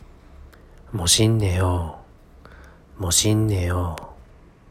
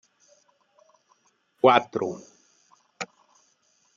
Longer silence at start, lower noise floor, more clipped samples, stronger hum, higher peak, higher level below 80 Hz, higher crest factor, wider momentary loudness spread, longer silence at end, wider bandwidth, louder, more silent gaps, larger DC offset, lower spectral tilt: second, 0 s vs 1.65 s; second, -48 dBFS vs -67 dBFS; neither; neither; about the same, -4 dBFS vs -4 dBFS; first, -42 dBFS vs -80 dBFS; second, 20 dB vs 26 dB; second, 16 LU vs 19 LU; second, 0.55 s vs 0.9 s; first, 16 kHz vs 7.6 kHz; first, -20 LUFS vs -24 LUFS; neither; neither; about the same, -4 dB/octave vs -5 dB/octave